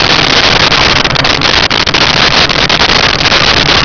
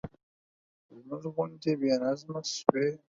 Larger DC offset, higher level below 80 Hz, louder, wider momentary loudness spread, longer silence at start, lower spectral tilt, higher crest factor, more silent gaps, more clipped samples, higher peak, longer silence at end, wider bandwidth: neither; first, -24 dBFS vs -68 dBFS; first, -5 LUFS vs -30 LUFS; second, 2 LU vs 13 LU; about the same, 0 s vs 0.05 s; second, -3 dB/octave vs -5 dB/octave; second, 8 dB vs 30 dB; second, none vs 0.23-0.89 s; neither; about the same, 0 dBFS vs -2 dBFS; about the same, 0 s vs 0.1 s; second, 5.4 kHz vs 7.8 kHz